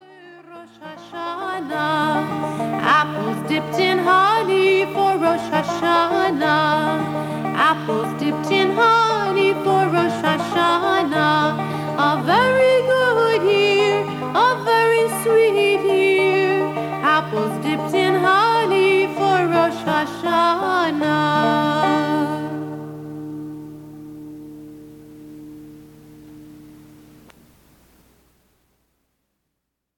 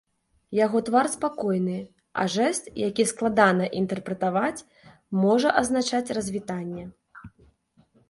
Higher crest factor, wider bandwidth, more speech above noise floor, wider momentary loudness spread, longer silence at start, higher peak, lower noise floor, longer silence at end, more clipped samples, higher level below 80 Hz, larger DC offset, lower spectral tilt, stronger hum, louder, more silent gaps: second, 14 dB vs 22 dB; first, 16.5 kHz vs 11.5 kHz; first, 59 dB vs 38 dB; first, 16 LU vs 12 LU; second, 0.2 s vs 0.5 s; about the same, -4 dBFS vs -4 dBFS; first, -78 dBFS vs -62 dBFS; first, 3.25 s vs 0.8 s; neither; about the same, -60 dBFS vs -60 dBFS; neither; about the same, -5 dB/octave vs -5 dB/octave; neither; first, -18 LUFS vs -25 LUFS; neither